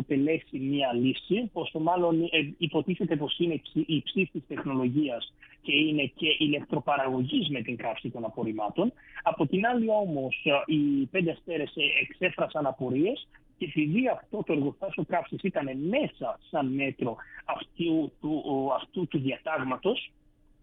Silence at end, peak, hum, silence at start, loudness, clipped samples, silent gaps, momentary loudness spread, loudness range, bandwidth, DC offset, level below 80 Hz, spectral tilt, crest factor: 0.55 s; -10 dBFS; none; 0 s; -29 LUFS; under 0.1%; none; 8 LU; 3 LU; 4 kHz; under 0.1%; -62 dBFS; -9 dB/octave; 18 dB